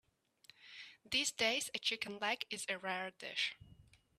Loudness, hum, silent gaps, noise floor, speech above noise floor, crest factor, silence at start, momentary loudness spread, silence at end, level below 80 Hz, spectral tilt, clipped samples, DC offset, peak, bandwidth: -38 LUFS; none; none; -67 dBFS; 27 dB; 22 dB; 0.6 s; 19 LU; 0.35 s; -76 dBFS; -1 dB/octave; under 0.1%; under 0.1%; -20 dBFS; 15 kHz